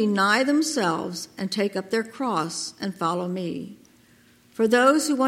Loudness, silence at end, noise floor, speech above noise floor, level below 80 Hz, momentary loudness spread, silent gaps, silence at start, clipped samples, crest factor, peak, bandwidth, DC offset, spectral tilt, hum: -24 LUFS; 0 s; -56 dBFS; 33 dB; -72 dBFS; 13 LU; none; 0 s; under 0.1%; 18 dB; -6 dBFS; 16.5 kHz; under 0.1%; -4 dB/octave; none